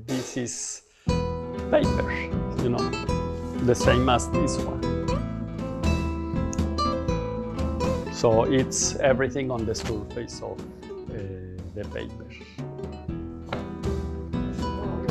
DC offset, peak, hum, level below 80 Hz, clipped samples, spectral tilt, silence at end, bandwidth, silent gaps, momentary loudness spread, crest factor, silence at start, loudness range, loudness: under 0.1%; -6 dBFS; none; -36 dBFS; under 0.1%; -5 dB/octave; 0 s; 13 kHz; none; 14 LU; 20 dB; 0 s; 10 LU; -27 LUFS